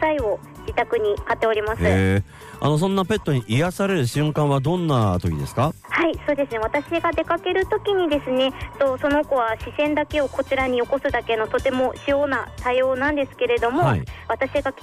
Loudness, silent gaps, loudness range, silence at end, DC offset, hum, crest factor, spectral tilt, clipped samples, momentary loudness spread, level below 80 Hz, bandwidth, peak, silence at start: -22 LUFS; none; 1 LU; 0 s; under 0.1%; none; 12 dB; -6.5 dB/octave; under 0.1%; 4 LU; -42 dBFS; 15.5 kHz; -8 dBFS; 0 s